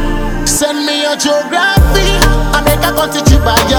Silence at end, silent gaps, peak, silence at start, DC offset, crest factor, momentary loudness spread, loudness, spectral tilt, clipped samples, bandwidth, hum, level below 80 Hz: 0 s; none; 0 dBFS; 0 s; under 0.1%; 10 dB; 4 LU; -11 LUFS; -4 dB/octave; 0.4%; over 20 kHz; none; -16 dBFS